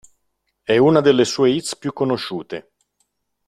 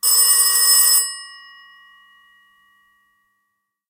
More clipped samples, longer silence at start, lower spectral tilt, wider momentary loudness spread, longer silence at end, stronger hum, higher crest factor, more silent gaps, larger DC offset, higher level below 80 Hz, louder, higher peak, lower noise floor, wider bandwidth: neither; first, 0.7 s vs 0.05 s; first, -5 dB/octave vs 6.5 dB/octave; first, 18 LU vs 13 LU; second, 0.85 s vs 2.6 s; neither; about the same, 18 dB vs 18 dB; neither; neither; first, -58 dBFS vs -88 dBFS; second, -18 LUFS vs -12 LUFS; about the same, -2 dBFS vs -2 dBFS; about the same, -72 dBFS vs -74 dBFS; second, 13 kHz vs 16 kHz